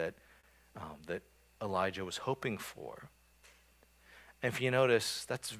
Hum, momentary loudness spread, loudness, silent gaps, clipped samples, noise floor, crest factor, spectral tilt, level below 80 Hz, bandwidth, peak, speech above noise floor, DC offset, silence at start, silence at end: none; 19 LU; -35 LUFS; none; under 0.1%; -66 dBFS; 22 dB; -4 dB/octave; -66 dBFS; 16 kHz; -16 dBFS; 31 dB; under 0.1%; 0 s; 0 s